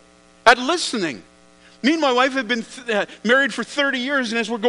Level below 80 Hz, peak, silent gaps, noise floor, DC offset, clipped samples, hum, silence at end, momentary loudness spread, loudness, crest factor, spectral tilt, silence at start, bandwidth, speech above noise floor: -60 dBFS; 0 dBFS; none; -50 dBFS; under 0.1%; under 0.1%; none; 0 s; 9 LU; -19 LUFS; 20 dB; -3 dB/octave; 0.45 s; 10.5 kHz; 30 dB